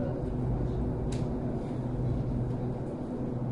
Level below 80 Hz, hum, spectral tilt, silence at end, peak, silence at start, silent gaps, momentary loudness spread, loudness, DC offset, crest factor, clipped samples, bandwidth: -40 dBFS; none; -9 dB/octave; 0 s; -20 dBFS; 0 s; none; 3 LU; -33 LUFS; under 0.1%; 12 dB; under 0.1%; 10.5 kHz